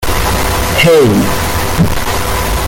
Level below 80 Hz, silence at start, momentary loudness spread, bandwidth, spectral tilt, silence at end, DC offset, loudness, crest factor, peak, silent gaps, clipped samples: -20 dBFS; 0 s; 7 LU; 17 kHz; -4.5 dB/octave; 0 s; under 0.1%; -11 LUFS; 10 dB; 0 dBFS; none; under 0.1%